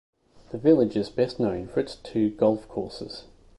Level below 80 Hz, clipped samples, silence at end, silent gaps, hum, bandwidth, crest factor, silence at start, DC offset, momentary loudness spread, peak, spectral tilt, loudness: -54 dBFS; under 0.1%; 0.35 s; none; none; 11.5 kHz; 18 dB; 0.5 s; under 0.1%; 17 LU; -8 dBFS; -7.5 dB/octave; -25 LUFS